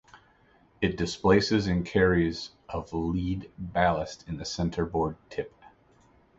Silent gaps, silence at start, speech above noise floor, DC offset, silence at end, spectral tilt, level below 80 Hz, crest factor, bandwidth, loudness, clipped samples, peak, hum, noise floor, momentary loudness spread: none; 0.15 s; 34 dB; under 0.1%; 0.9 s; -6 dB/octave; -46 dBFS; 20 dB; 8 kHz; -28 LUFS; under 0.1%; -8 dBFS; none; -62 dBFS; 14 LU